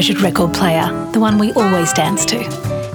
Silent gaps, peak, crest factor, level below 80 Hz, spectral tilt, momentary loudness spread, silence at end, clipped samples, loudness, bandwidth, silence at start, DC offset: none; 0 dBFS; 14 dB; -44 dBFS; -4.5 dB/octave; 5 LU; 0 s; under 0.1%; -15 LUFS; over 20 kHz; 0 s; under 0.1%